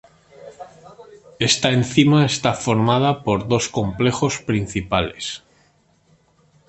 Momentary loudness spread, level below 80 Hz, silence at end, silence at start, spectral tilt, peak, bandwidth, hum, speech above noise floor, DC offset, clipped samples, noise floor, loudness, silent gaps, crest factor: 14 LU; -46 dBFS; 1.3 s; 0.4 s; -5 dB/octave; -2 dBFS; 8.8 kHz; none; 40 dB; under 0.1%; under 0.1%; -59 dBFS; -19 LUFS; none; 18 dB